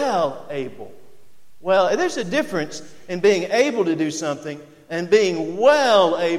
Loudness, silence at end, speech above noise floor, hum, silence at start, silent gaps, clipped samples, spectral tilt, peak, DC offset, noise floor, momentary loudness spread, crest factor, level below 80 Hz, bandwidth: -20 LUFS; 0 s; 38 dB; none; 0 s; none; under 0.1%; -4 dB/octave; -2 dBFS; under 0.1%; -58 dBFS; 15 LU; 18 dB; -64 dBFS; 14.5 kHz